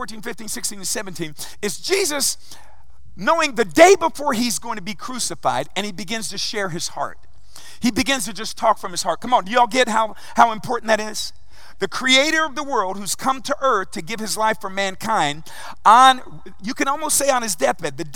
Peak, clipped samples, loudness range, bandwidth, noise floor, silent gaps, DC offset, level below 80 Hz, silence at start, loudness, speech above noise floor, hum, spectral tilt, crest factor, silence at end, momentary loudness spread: 0 dBFS; under 0.1%; 6 LU; 17.5 kHz; -45 dBFS; none; 3%; -54 dBFS; 0 s; -19 LUFS; 25 dB; none; -2 dB/octave; 20 dB; 0.05 s; 14 LU